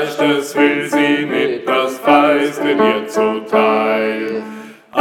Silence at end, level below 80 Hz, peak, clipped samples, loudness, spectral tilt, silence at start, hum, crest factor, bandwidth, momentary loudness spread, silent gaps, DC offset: 0 s; -66 dBFS; 0 dBFS; under 0.1%; -15 LUFS; -4.5 dB/octave; 0 s; none; 14 dB; 16.5 kHz; 10 LU; none; under 0.1%